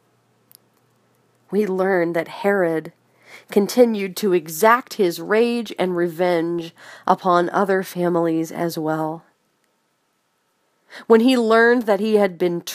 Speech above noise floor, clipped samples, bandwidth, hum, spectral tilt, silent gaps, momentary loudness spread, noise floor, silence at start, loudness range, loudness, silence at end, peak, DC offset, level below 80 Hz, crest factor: 49 dB; under 0.1%; 15.5 kHz; none; -5.5 dB/octave; none; 10 LU; -68 dBFS; 1.5 s; 5 LU; -19 LUFS; 0 s; 0 dBFS; under 0.1%; -76 dBFS; 20 dB